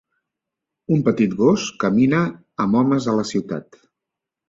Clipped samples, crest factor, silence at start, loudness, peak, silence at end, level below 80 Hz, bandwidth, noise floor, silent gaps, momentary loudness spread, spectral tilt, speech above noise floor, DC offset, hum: under 0.1%; 18 dB; 0.9 s; -19 LUFS; -2 dBFS; 0.9 s; -56 dBFS; 7.8 kHz; -84 dBFS; none; 9 LU; -6.5 dB/octave; 66 dB; under 0.1%; none